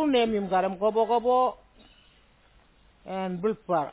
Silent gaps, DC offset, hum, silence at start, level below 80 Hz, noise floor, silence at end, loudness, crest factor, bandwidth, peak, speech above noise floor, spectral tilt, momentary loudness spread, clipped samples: none; under 0.1%; none; 0 s; -60 dBFS; -60 dBFS; 0 s; -26 LUFS; 14 dB; 4 kHz; -12 dBFS; 34 dB; -9.5 dB/octave; 9 LU; under 0.1%